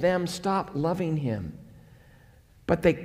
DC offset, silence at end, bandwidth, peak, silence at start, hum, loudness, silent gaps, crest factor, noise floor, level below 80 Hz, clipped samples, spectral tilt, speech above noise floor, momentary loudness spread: under 0.1%; 0 s; 16 kHz; -8 dBFS; 0 s; none; -28 LUFS; none; 20 dB; -55 dBFS; -52 dBFS; under 0.1%; -6.5 dB/octave; 29 dB; 16 LU